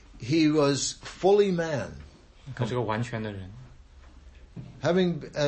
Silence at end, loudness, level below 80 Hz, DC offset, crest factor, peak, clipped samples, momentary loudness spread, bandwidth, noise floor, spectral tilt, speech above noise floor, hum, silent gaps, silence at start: 0 s; -26 LUFS; -52 dBFS; under 0.1%; 16 dB; -10 dBFS; under 0.1%; 23 LU; 8.8 kHz; -50 dBFS; -5.5 dB/octave; 25 dB; none; none; 0.15 s